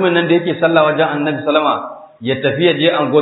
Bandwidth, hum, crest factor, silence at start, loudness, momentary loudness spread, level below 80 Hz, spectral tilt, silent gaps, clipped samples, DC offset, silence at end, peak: 4.1 kHz; none; 14 dB; 0 s; -14 LUFS; 9 LU; -62 dBFS; -10.5 dB/octave; none; under 0.1%; under 0.1%; 0 s; 0 dBFS